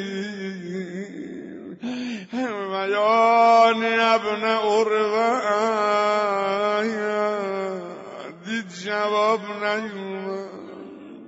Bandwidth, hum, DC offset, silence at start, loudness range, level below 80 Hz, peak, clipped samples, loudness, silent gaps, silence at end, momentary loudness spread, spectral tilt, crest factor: 8 kHz; none; under 0.1%; 0 s; 8 LU; -72 dBFS; -6 dBFS; under 0.1%; -22 LUFS; none; 0 s; 19 LU; -2.5 dB/octave; 16 dB